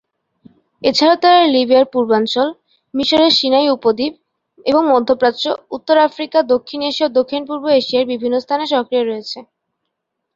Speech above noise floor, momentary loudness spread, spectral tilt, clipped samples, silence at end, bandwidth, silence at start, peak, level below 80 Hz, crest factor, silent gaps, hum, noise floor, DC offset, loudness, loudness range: 61 dB; 10 LU; -4 dB/octave; under 0.1%; 0.9 s; 7.6 kHz; 0.8 s; -2 dBFS; -58 dBFS; 14 dB; none; none; -75 dBFS; under 0.1%; -15 LUFS; 4 LU